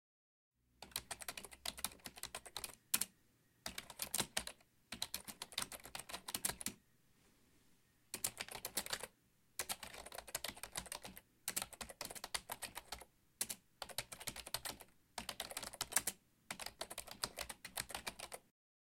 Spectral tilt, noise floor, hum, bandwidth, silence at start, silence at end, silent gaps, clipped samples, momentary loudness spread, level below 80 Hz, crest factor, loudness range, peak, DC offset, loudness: -0.5 dB/octave; -75 dBFS; none; 17 kHz; 0.8 s; 0.45 s; none; under 0.1%; 12 LU; -70 dBFS; 34 dB; 3 LU; -14 dBFS; under 0.1%; -45 LUFS